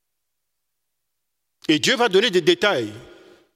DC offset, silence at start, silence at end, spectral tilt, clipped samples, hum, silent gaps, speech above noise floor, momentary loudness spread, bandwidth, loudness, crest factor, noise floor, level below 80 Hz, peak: under 0.1%; 1.7 s; 0.55 s; -3.5 dB/octave; under 0.1%; none; none; 61 dB; 12 LU; 15 kHz; -18 LUFS; 20 dB; -80 dBFS; -66 dBFS; -4 dBFS